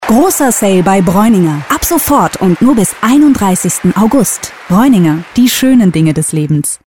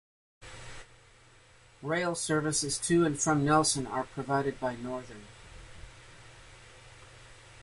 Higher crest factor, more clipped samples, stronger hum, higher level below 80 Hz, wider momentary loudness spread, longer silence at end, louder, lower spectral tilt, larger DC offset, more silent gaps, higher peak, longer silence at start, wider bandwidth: second, 8 dB vs 20 dB; neither; neither; first, -36 dBFS vs -58 dBFS; second, 5 LU vs 26 LU; about the same, 0.1 s vs 0 s; first, -9 LUFS vs -29 LUFS; about the same, -5 dB/octave vs -4 dB/octave; first, 1% vs under 0.1%; neither; first, 0 dBFS vs -14 dBFS; second, 0 s vs 0.4 s; first, 18 kHz vs 11.5 kHz